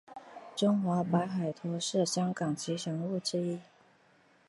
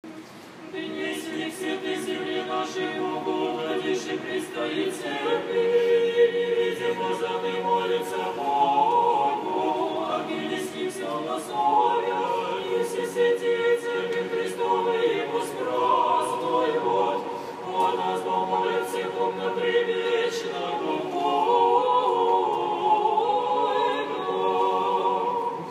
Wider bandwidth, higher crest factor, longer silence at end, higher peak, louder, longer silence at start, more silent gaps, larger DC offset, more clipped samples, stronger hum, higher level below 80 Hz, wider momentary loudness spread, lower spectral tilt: second, 11.5 kHz vs 15 kHz; about the same, 18 dB vs 16 dB; first, 0.85 s vs 0 s; second, -16 dBFS vs -10 dBFS; second, -32 LUFS vs -25 LUFS; about the same, 0.1 s vs 0.05 s; neither; neither; neither; neither; about the same, -76 dBFS vs -76 dBFS; about the same, 10 LU vs 8 LU; first, -5.5 dB/octave vs -4 dB/octave